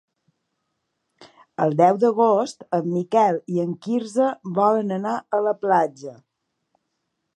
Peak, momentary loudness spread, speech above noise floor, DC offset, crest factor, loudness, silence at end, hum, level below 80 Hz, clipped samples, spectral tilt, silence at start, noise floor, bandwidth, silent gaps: -4 dBFS; 8 LU; 56 dB; under 0.1%; 20 dB; -21 LUFS; 1.25 s; none; -76 dBFS; under 0.1%; -7 dB/octave; 1.2 s; -77 dBFS; 11 kHz; none